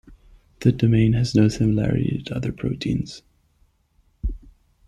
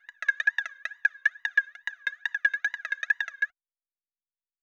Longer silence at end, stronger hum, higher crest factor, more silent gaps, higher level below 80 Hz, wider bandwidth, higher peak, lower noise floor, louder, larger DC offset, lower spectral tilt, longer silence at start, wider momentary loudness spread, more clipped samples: second, 0.5 s vs 1.15 s; neither; about the same, 18 dB vs 22 dB; neither; first, -38 dBFS vs under -90 dBFS; about the same, 9.8 kHz vs 9.6 kHz; first, -4 dBFS vs -10 dBFS; second, -62 dBFS vs under -90 dBFS; first, -22 LUFS vs -28 LUFS; neither; first, -7.5 dB/octave vs 4 dB/octave; about the same, 0.1 s vs 0.2 s; first, 15 LU vs 7 LU; neither